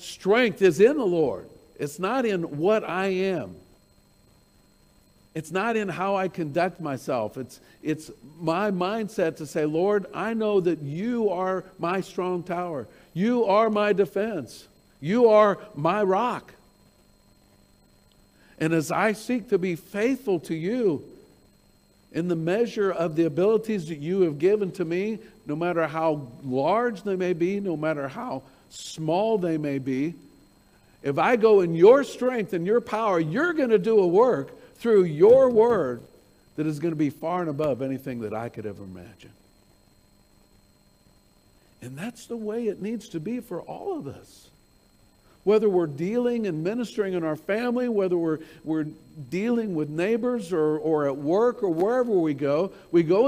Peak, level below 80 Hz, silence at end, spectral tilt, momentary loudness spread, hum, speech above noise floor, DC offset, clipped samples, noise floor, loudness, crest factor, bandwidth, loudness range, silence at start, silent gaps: -4 dBFS; -64 dBFS; 0 s; -6.5 dB/octave; 14 LU; none; 35 dB; under 0.1%; under 0.1%; -59 dBFS; -24 LUFS; 20 dB; 15.5 kHz; 11 LU; 0 s; none